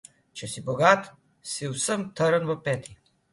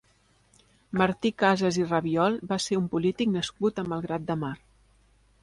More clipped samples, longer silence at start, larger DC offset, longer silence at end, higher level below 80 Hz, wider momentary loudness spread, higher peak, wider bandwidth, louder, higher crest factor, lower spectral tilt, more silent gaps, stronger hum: neither; second, 0.35 s vs 0.9 s; neither; second, 0.4 s vs 0.85 s; about the same, -64 dBFS vs -60 dBFS; first, 19 LU vs 8 LU; first, -4 dBFS vs -10 dBFS; about the same, 11.5 kHz vs 11.5 kHz; about the same, -26 LUFS vs -27 LUFS; first, 24 dB vs 18 dB; second, -4 dB/octave vs -5.5 dB/octave; neither; neither